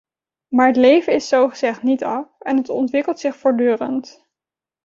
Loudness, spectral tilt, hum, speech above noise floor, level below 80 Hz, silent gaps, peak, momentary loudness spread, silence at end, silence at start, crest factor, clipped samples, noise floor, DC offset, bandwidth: -18 LUFS; -4.5 dB/octave; none; 72 dB; -64 dBFS; none; -2 dBFS; 10 LU; 0.75 s; 0.5 s; 18 dB; under 0.1%; -89 dBFS; under 0.1%; 7.6 kHz